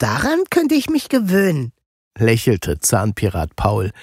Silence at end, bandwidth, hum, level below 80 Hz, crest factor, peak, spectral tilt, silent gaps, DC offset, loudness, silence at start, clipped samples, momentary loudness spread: 0 s; 16 kHz; none; -36 dBFS; 16 dB; -2 dBFS; -5.5 dB/octave; 1.86-2.11 s; under 0.1%; -18 LUFS; 0 s; under 0.1%; 5 LU